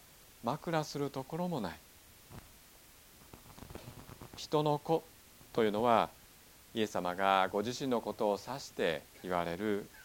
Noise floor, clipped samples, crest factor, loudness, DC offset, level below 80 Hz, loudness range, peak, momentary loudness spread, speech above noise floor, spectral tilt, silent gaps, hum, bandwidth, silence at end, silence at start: -59 dBFS; under 0.1%; 24 dB; -35 LUFS; under 0.1%; -64 dBFS; 10 LU; -12 dBFS; 23 LU; 25 dB; -5 dB/octave; none; none; 17.5 kHz; 0 s; 0.45 s